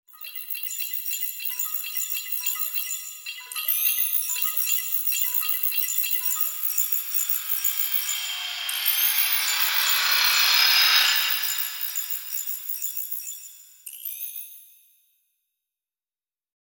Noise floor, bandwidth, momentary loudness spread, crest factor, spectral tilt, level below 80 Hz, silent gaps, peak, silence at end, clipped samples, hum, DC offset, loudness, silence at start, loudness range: under -90 dBFS; 17 kHz; 15 LU; 20 dB; 6 dB/octave; -84 dBFS; none; -6 dBFS; 2.1 s; under 0.1%; none; under 0.1%; -22 LUFS; 0.15 s; 13 LU